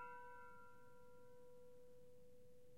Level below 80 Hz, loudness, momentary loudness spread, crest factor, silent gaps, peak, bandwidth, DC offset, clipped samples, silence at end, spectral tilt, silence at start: -84 dBFS; -64 LUFS; 10 LU; 18 dB; none; -44 dBFS; 15.5 kHz; under 0.1%; under 0.1%; 0 s; -5 dB/octave; 0 s